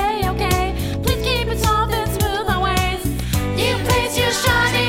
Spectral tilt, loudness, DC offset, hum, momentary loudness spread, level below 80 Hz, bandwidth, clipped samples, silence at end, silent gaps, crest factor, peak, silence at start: -4 dB/octave; -19 LUFS; under 0.1%; none; 5 LU; -28 dBFS; 19 kHz; under 0.1%; 0 s; none; 14 dB; -4 dBFS; 0 s